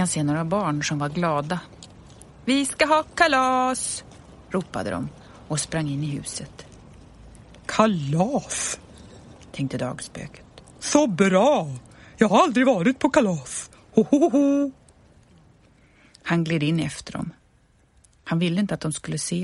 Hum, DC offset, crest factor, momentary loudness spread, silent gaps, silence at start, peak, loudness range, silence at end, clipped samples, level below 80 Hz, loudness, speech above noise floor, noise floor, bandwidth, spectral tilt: none; under 0.1%; 22 dB; 16 LU; none; 0 s; -2 dBFS; 8 LU; 0 s; under 0.1%; -54 dBFS; -23 LUFS; 37 dB; -59 dBFS; 11.5 kHz; -5 dB/octave